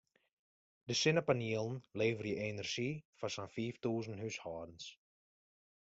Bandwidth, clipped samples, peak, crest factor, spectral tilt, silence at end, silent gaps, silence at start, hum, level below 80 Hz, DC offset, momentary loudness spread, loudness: 8 kHz; under 0.1%; -18 dBFS; 22 dB; -4.5 dB/octave; 0.9 s; 3.05-3.13 s; 0.85 s; none; -74 dBFS; under 0.1%; 14 LU; -38 LUFS